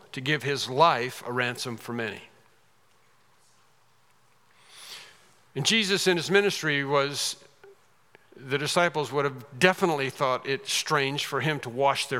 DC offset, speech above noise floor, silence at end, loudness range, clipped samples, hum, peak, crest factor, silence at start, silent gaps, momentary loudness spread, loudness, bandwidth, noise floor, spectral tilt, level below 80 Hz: under 0.1%; 38 dB; 0 s; 10 LU; under 0.1%; none; -2 dBFS; 26 dB; 0.15 s; none; 15 LU; -26 LUFS; 16.5 kHz; -65 dBFS; -3.5 dB/octave; -80 dBFS